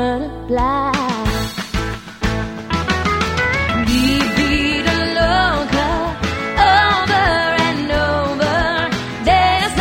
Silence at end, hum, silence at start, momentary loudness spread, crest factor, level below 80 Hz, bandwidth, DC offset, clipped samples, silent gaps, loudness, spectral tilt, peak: 0 s; none; 0 s; 9 LU; 14 dB; -28 dBFS; 16.5 kHz; 0.2%; under 0.1%; none; -16 LUFS; -4.5 dB/octave; -2 dBFS